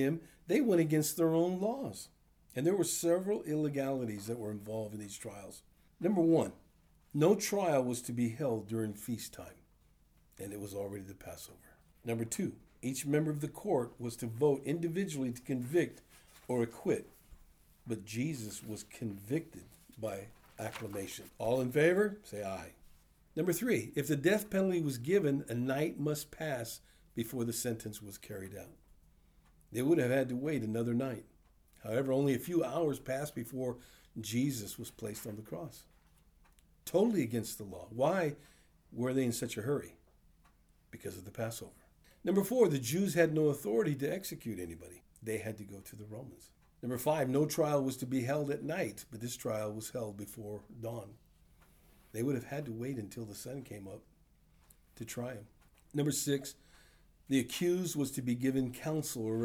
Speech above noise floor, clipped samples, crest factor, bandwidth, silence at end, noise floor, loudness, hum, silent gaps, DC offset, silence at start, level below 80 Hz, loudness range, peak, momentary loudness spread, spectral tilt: 32 dB; under 0.1%; 22 dB; over 20 kHz; 0 s; -67 dBFS; -35 LUFS; none; none; under 0.1%; 0 s; -66 dBFS; 9 LU; -14 dBFS; 17 LU; -5.5 dB/octave